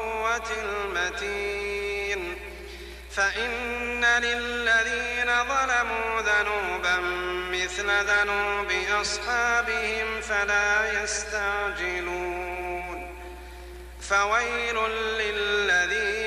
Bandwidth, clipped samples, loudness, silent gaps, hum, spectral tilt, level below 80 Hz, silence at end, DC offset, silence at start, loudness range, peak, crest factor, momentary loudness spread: 14.5 kHz; under 0.1%; -25 LUFS; none; none; -2 dB/octave; -46 dBFS; 0 s; under 0.1%; 0 s; 5 LU; -12 dBFS; 14 dB; 12 LU